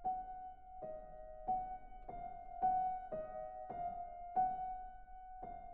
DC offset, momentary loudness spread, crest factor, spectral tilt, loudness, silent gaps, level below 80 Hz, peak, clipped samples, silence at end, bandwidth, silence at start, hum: under 0.1%; 15 LU; 18 dB; -6.5 dB/octave; -44 LUFS; none; -60 dBFS; -26 dBFS; under 0.1%; 0 s; 3.2 kHz; 0 s; none